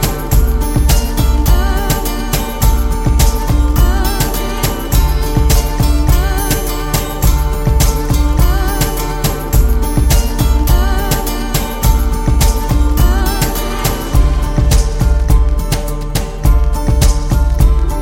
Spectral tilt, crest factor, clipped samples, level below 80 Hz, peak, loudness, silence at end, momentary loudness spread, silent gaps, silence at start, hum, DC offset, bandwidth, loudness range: -5 dB/octave; 12 dB; under 0.1%; -12 dBFS; 0 dBFS; -14 LUFS; 0 s; 4 LU; none; 0 s; none; under 0.1%; 17 kHz; 1 LU